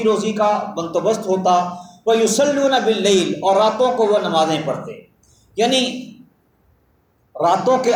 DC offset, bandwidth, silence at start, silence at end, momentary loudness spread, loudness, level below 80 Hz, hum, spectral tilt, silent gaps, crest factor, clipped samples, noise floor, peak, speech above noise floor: under 0.1%; 19 kHz; 0 s; 0 s; 9 LU; -17 LUFS; -62 dBFS; none; -4 dB/octave; none; 14 dB; under 0.1%; -60 dBFS; -4 dBFS; 43 dB